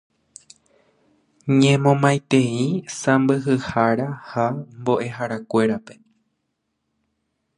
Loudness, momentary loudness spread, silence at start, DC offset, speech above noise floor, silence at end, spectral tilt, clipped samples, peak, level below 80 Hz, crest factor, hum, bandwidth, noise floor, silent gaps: -20 LUFS; 10 LU; 1.45 s; under 0.1%; 55 dB; 1.65 s; -6 dB/octave; under 0.1%; -2 dBFS; -60 dBFS; 20 dB; none; 11 kHz; -75 dBFS; none